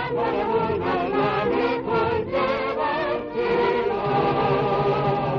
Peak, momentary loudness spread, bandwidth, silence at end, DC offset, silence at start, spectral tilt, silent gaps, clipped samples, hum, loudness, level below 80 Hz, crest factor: -10 dBFS; 3 LU; 6.4 kHz; 0 s; under 0.1%; 0 s; -8 dB/octave; none; under 0.1%; none; -23 LUFS; -46 dBFS; 12 dB